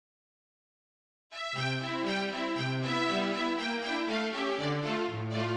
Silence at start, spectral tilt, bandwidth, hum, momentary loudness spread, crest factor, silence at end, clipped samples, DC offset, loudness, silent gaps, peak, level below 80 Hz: 1.3 s; -5 dB/octave; 11 kHz; none; 4 LU; 16 dB; 0 s; under 0.1%; under 0.1%; -32 LUFS; none; -18 dBFS; -70 dBFS